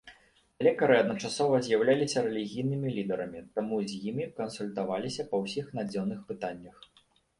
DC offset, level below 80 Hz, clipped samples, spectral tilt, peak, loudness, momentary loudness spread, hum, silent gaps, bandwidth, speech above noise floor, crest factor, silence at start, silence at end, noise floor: under 0.1%; -68 dBFS; under 0.1%; -5.5 dB/octave; -12 dBFS; -30 LUFS; 11 LU; none; none; 11.5 kHz; 32 dB; 20 dB; 0.05 s; 0.7 s; -62 dBFS